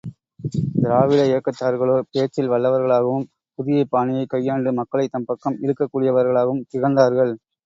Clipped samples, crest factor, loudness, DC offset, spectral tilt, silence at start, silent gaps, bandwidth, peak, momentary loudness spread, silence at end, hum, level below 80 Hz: under 0.1%; 18 dB; -20 LUFS; under 0.1%; -8 dB/octave; 0.05 s; none; 7.6 kHz; -2 dBFS; 9 LU; 0.3 s; none; -58 dBFS